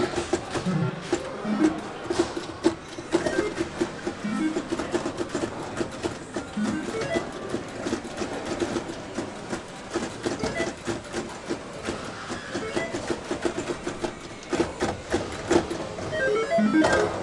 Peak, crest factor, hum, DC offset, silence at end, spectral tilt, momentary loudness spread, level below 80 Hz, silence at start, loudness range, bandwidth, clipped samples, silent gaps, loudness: -8 dBFS; 20 dB; none; under 0.1%; 0 s; -5 dB/octave; 9 LU; -50 dBFS; 0 s; 4 LU; 11.5 kHz; under 0.1%; none; -28 LUFS